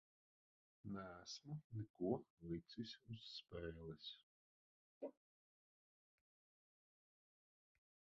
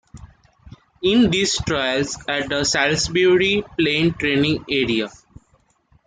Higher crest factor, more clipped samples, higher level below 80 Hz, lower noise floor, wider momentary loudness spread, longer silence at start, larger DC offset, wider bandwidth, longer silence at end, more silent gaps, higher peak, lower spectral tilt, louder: first, 26 dB vs 16 dB; neither; second, -74 dBFS vs -46 dBFS; first, under -90 dBFS vs -61 dBFS; first, 11 LU vs 7 LU; first, 0.85 s vs 0.15 s; neither; second, 7.4 kHz vs 9.6 kHz; first, 3.1 s vs 0.95 s; first, 1.64-1.70 s, 1.90-1.94 s, 2.30-2.37 s, 4.23-5.01 s vs none; second, -30 dBFS vs -4 dBFS; first, -5.5 dB/octave vs -4 dB/octave; second, -52 LUFS vs -19 LUFS